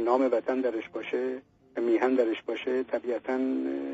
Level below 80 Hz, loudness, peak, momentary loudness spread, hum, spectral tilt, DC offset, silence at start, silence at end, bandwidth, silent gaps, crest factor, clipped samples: -72 dBFS; -29 LUFS; -10 dBFS; 9 LU; none; -3 dB/octave; under 0.1%; 0 s; 0 s; 7.6 kHz; none; 18 dB; under 0.1%